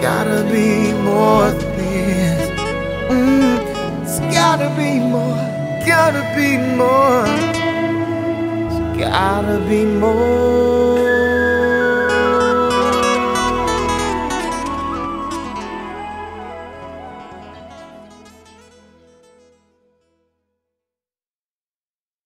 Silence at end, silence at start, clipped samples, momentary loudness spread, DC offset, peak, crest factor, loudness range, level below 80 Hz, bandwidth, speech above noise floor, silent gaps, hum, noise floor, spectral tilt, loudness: 4.1 s; 0 s; under 0.1%; 15 LU; under 0.1%; 0 dBFS; 16 dB; 13 LU; -38 dBFS; 16 kHz; over 76 dB; none; none; under -90 dBFS; -5.5 dB/octave; -16 LUFS